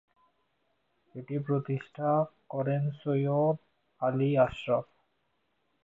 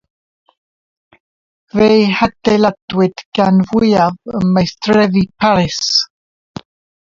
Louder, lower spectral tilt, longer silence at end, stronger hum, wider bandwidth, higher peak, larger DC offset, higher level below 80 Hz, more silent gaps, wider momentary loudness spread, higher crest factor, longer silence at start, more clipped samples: second, -30 LUFS vs -13 LUFS; first, -10 dB/octave vs -5.5 dB/octave; about the same, 1 s vs 0.95 s; neither; about the same, 7.4 kHz vs 7.6 kHz; second, -12 dBFS vs 0 dBFS; neither; second, -66 dBFS vs -44 dBFS; second, none vs 2.82-2.88 s, 3.25-3.32 s; about the same, 10 LU vs 11 LU; first, 20 dB vs 14 dB; second, 1.15 s vs 1.75 s; neither